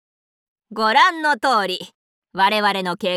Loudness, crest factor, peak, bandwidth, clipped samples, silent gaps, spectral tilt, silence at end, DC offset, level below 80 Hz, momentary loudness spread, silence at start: -18 LUFS; 18 dB; -2 dBFS; 16.5 kHz; under 0.1%; 1.95-2.22 s; -3.5 dB/octave; 0 s; under 0.1%; -70 dBFS; 14 LU; 0.7 s